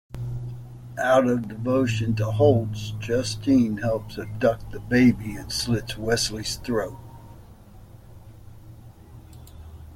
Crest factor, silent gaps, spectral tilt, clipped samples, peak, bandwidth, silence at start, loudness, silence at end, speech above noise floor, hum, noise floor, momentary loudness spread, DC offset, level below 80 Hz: 20 dB; none; -5.5 dB/octave; under 0.1%; -6 dBFS; 16 kHz; 0.1 s; -24 LUFS; 0 s; 23 dB; none; -46 dBFS; 18 LU; under 0.1%; -46 dBFS